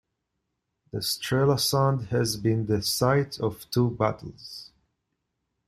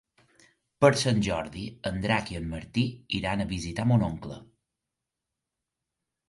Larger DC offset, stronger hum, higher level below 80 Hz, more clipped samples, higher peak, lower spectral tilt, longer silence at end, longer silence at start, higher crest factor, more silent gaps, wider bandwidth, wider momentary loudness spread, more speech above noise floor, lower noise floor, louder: neither; neither; second, -56 dBFS vs -48 dBFS; neither; second, -8 dBFS vs -4 dBFS; about the same, -5 dB/octave vs -5.5 dB/octave; second, 1 s vs 1.85 s; first, 0.95 s vs 0.8 s; second, 20 dB vs 26 dB; neither; first, 16 kHz vs 11.5 kHz; first, 17 LU vs 13 LU; second, 55 dB vs 59 dB; second, -80 dBFS vs -87 dBFS; first, -25 LUFS vs -28 LUFS